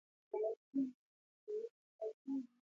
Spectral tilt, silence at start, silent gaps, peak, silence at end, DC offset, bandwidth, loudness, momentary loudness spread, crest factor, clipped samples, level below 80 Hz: -8 dB/octave; 0.35 s; 0.57-0.73 s, 0.94-1.47 s, 1.70-1.99 s, 2.14-2.25 s; -30 dBFS; 0.25 s; under 0.1%; 6.8 kHz; -45 LUFS; 7 LU; 16 dB; under 0.1%; under -90 dBFS